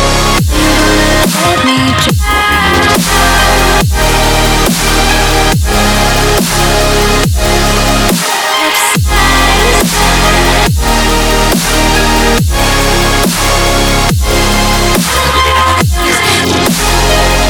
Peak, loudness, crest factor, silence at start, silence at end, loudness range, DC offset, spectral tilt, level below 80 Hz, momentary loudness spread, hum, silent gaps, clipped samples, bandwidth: 0 dBFS; -8 LUFS; 8 dB; 0 s; 0 s; 1 LU; under 0.1%; -3.5 dB/octave; -14 dBFS; 2 LU; none; none; under 0.1%; 19.5 kHz